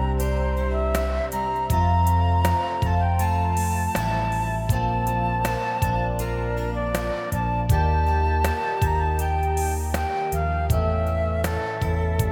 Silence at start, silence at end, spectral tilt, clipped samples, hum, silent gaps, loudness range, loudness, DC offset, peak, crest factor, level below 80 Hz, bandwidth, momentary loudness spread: 0 s; 0 s; -6.5 dB/octave; under 0.1%; none; none; 2 LU; -23 LUFS; under 0.1%; -4 dBFS; 18 dB; -28 dBFS; 18 kHz; 5 LU